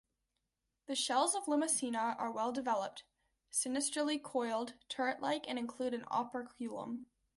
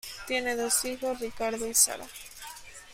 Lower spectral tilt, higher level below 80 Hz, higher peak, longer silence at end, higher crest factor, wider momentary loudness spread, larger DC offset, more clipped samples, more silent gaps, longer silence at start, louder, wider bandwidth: first, -1.5 dB/octave vs 0 dB/octave; second, -80 dBFS vs -58 dBFS; second, -18 dBFS vs -8 dBFS; first, 0.35 s vs 0 s; about the same, 20 dB vs 24 dB; second, 11 LU vs 20 LU; neither; neither; neither; first, 0.9 s vs 0.05 s; second, -37 LUFS vs -27 LUFS; second, 12 kHz vs 16 kHz